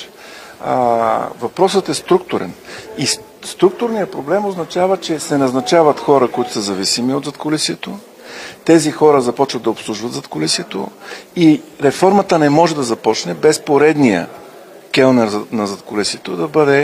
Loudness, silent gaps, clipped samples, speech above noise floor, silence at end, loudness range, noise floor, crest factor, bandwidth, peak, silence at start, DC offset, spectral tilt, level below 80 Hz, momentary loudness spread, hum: -15 LUFS; none; under 0.1%; 23 dB; 0 s; 4 LU; -38 dBFS; 16 dB; 16 kHz; 0 dBFS; 0 s; under 0.1%; -4.5 dB/octave; -58 dBFS; 14 LU; none